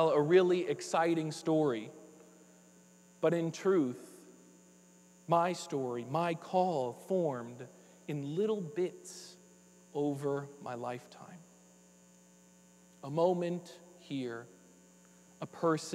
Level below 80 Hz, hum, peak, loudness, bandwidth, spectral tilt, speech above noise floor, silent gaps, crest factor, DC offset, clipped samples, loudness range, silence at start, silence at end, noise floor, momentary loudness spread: -84 dBFS; 60 Hz at -65 dBFS; -14 dBFS; -34 LUFS; 14 kHz; -6 dB/octave; 29 dB; none; 20 dB; under 0.1%; under 0.1%; 7 LU; 0 s; 0 s; -62 dBFS; 20 LU